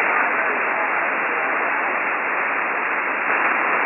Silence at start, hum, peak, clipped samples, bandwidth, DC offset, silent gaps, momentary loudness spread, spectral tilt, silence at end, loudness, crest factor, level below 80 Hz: 0 s; none; -6 dBFS; under 0.1%; 3.1 kHz; under 0.1%; none; 3 LU; -0.5 dB/octave; 0 s; -20 LUFS; 14 dB; -74 dBFS